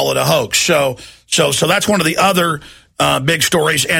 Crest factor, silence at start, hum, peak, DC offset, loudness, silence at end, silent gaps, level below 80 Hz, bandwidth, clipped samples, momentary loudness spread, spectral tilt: 14 dB; 0 s; none; 0 dBFS; under 0.1%; -14 LUFS; 0 s; none; -46 dBFS; 16.5 kHz; under 0.1%; 6 LU; -3 dB/octave